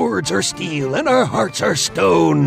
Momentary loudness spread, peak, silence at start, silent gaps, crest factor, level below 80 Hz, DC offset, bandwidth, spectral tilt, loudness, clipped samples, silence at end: 6 LU; -4 dBFS; 0 s; none; 12 dB; -50 dBFS; under 0.1%; 15.5 kHz; -4.5 dB/octave; -17 LUFS; under 0.1%; 0 s